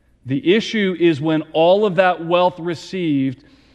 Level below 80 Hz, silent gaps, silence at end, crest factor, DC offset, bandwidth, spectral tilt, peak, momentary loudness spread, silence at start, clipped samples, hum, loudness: -60 dBFS; none; 0.4 s; 16 dB; under 0.1%; 9 kHz; -6.5 dB/octave; -2 dBFS; 10 LU; 0.25 s; under 0.1%; none; -18 LUFS